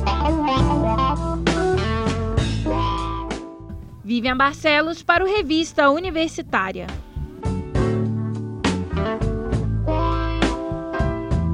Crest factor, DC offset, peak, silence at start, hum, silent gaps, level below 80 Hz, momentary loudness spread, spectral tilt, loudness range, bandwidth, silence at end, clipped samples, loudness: 18 dB; under 0.1%; -2 dBFS; 0 s; none; none; -30 dBFS; 11 LU; -6 dB/octave; 4 LU; 11 kHz; 0 s; under 0.1%; -21 LUFS